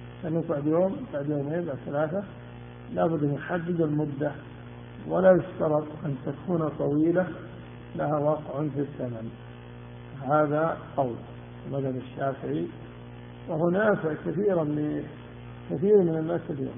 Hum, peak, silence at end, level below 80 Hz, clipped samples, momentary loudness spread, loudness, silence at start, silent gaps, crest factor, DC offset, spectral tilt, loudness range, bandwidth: 60 Hz at -45 dBFS; -8 dBFS; 0 s; -56 dBFS; under 0.1%; 20 LU; -27 LUFS; 0 s; none; 20 dB; under 0.1%; -8 dB/octave; 4 LU; 3.7 kHz